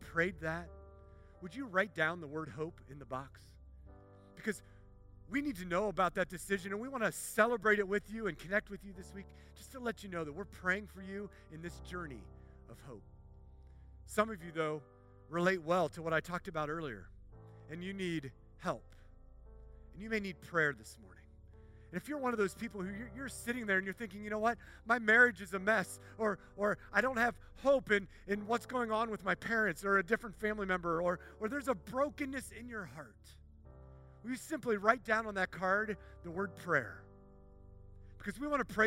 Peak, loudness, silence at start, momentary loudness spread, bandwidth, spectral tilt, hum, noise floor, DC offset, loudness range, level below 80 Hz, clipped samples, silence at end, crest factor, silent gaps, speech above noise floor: -12 dBFS; -36 LUFS; 0 s; 18 LU; 16 kHz; -5 dB/octave; none; -58 dBFS; under 0.1%; 10 LU; -60 dBFS; under 0.1%; 0 s; 24 dB; none; 21 dB